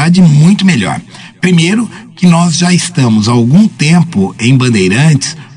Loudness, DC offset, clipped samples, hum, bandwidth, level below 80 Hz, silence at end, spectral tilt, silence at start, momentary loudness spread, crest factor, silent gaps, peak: -8 LUFS; under 0.1%; 2%; none; 11 kHz; -48 dBFS; 0.1 s; -5.5 dB/octave; 0 s; 7 LU; 8 dB; none; 0 dBFS